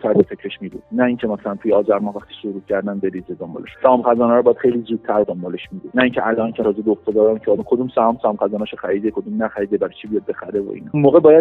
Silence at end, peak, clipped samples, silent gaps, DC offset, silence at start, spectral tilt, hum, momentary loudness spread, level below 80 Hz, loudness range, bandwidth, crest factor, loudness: 0 s; 0 dBFS; under 0.1%; none; under 0.1%; 0.05 s; -9.5 dB/octave; none; 14 LU; -56 dBFS; 3 LU; 4.1 kHz; 18 dB; -18 LUFS